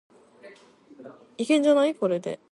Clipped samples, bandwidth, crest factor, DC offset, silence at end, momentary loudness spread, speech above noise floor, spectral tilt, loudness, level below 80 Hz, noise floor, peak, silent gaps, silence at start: under 0.1%; 11.5 kHz; 16 dB; under 0.1%; 0.15 s; 14 LU; 29 dB; -5 dB/octave; -23 LUFS; -80 dBFS; -53 dBFS; -10 dBFS; none; 0.45 s